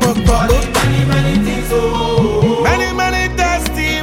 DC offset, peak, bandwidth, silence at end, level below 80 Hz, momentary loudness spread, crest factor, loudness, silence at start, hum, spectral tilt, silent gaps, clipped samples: under 0.1%; 0 dBFS; 17 kHz; 0 s; -22 dBFS; 3 LU; 14 dB; -14 LUFS; 0 s; none; -5 dB/octave; none; under 0.1%